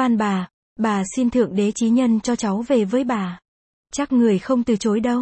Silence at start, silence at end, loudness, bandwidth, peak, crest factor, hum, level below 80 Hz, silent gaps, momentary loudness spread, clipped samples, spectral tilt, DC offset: 0 s; 0 s; -20 LUFS; 8.8 kHz; -6 dBFS; 14 dB; none; -54 dBFS; 0.54-0.76 s, 3.48-3.84 s; 9 LU; under 0.1%; -6 dB/octave; under 0.1%